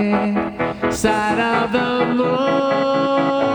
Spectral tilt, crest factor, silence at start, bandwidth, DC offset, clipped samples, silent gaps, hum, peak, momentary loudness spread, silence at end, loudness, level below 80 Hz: -5.5 dB/octave; 14 dB; 0 s; 20 kHz; under 0.1%; under 0.1%; none; none; -4 dBFS; 4 LU; 0 s; -18 LUFS; -46 dBFS